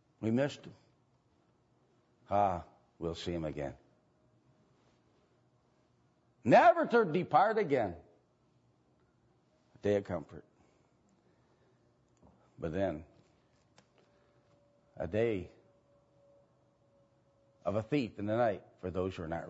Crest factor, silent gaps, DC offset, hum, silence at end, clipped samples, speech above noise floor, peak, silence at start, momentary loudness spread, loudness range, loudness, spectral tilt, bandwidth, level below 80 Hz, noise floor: 24 dB; none; under 0.1%; none; 0 s; under 0.1%; 40 dB; -12 dBFS; 0.2 s; 16 LU; 14 LU; -33 LUFS; -5.5 dB/octave; 7.6 kHz; -64 dBFS; -72 dBFS